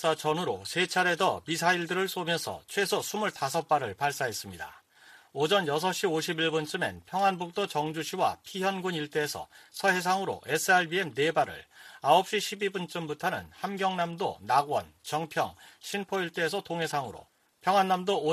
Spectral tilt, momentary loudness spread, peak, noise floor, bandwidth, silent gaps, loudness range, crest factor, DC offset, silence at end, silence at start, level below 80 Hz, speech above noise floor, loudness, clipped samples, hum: -3.5 dB/octave; 10 LU; -8 dBFS; -57 dBFS; 15 kHz; none; 4 LU; 20 dB; under 0.1%; 0 s; 0 s; -70 dBFS; 27 dB; -29 LUFS; under 0.1%; none